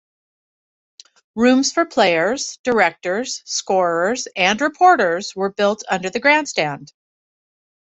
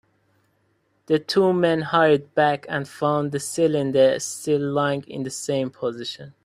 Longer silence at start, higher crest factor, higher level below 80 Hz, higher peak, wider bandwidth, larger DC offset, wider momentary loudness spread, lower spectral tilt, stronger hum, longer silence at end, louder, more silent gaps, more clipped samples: first, 1.35 s vs 1.1 s; about the same, 18 dB vs 18 dB; about the same, -62 dBFS vs -64 dBFS; about the same, -2 dBFS vs -4 dBFS; second, 8.4 kHz vs 15.5 kHz; neither; about the same, 9 LU vs 10 LU; second, -3 dB/octave vs -5 dB/octave; neither; first, 0.95 s vs 0.15 s; first, -18 LUFS vs -22 LUFS; first, 2.59-2.64 s vs none; neither